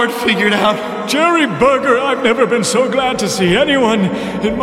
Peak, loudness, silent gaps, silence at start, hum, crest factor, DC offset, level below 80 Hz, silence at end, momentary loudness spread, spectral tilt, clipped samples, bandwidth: -2 dBFS; -13 LUFS; none; 0 s; none; 12 dB; under 0.1%; -44 dBFS; 0 s; 5 LU; -4 dB/octave; under 0.1%; 16.5 kHz